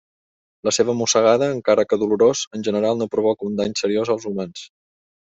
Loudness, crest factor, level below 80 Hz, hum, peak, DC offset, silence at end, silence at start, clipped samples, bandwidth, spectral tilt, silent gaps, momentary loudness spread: -20 LUFS; 16 dB; -62 dBFS; none; -4 dBFS; under 0.1%; 0.7 s; 0.65 s; under 0.1%; 8.2 kHz; -4 dB/octave; 2.47-2.51 s; 10 LU